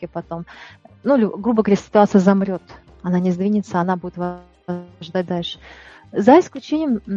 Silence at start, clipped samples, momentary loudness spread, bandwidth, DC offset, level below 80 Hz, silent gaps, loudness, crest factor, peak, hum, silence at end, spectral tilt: 0 s; under 0.1%; 17 LU; 7.6 kHz; under 0.1%; -54 dBFS; none; -19 LUFS; 18 dB; 0 dBFS; none; 0 s; -7.5 dB/octave